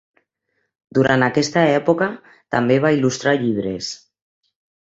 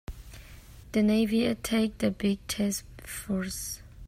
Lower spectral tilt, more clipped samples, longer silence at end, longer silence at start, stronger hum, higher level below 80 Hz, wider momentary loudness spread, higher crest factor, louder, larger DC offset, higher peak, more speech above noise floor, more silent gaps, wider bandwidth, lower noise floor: about the same, -5.5 dB/octave vs -5 dB/octave; neither; first, 0.9 s vs 0 s; first, 0.95 s vs 0.1 s; neither; second, -56 dBFS vs -48 dBFS; second, 11 LU vs 18 LU; about the same, 18 dB vs 16 dB; first, -18 LUFS vs -29 LUFS; neither; first, -2 dBFS vs -14 dBFS; first, 54 dB vs 20 dB; neither; second, 8 kHz vs 16 kHz; first, -72 dBFS vs -48 dBFS